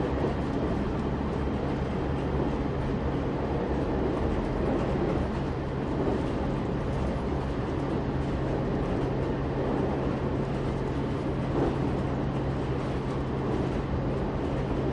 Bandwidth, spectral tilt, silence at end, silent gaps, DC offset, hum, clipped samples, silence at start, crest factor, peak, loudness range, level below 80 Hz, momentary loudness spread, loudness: 10 kHz; -8.5 dB/octave; 0 s; none; under 0.1%; none; under 0.1%; 0 s; 16 dB; -14 dBFS; 1 LU; -36 dBFS; 2 LU; -30 LUFS